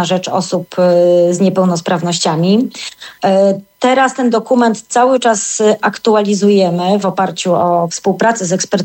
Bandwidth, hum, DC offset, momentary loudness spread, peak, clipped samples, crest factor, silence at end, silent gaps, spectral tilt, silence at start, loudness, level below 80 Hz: 16.5 kHz; none; under 0.1%; 5 LU; -2 dBFS; under 0.1%; 10 dB; 0 s; none; -5 dB/octave; 0 s; -13 LUFS; -62 dBFS